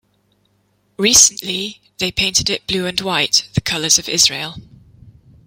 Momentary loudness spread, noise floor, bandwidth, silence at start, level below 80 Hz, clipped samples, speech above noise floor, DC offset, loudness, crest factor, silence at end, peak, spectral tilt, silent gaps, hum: 14 LU; -62 dBFS; 17 kHz; 1 s; -46 dBFS; under 0.1%; 45 dB; under 0.1%; -14 LUFS; 18 dB; 0.35 s; 0 dBFS; -1 dB/octave; none; none